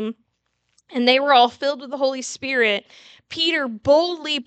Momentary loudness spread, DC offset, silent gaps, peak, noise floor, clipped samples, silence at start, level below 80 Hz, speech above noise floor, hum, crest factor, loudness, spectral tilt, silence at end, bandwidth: 12 LU; under 0.1%; none; -2 dBFS; -71 dBFS; under 0.1%; 0 s; -64 dBFS; 51 dB; none; 18 dB; -19 LUFS; -2.5 dB/octave; 0.05 s; 9 kHz